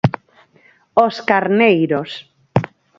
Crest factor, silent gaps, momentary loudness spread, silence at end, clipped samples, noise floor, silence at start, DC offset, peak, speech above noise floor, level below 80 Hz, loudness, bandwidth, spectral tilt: 18 dB; none; 16 LU; 0.3 s; under 0.1%; -53 dBFS; 0.05 s; under 0.1%; 0 dBFS; 38 dB; -50 dBFS; -16 LUFS; 7.6 kHz; -7.5 dB/octave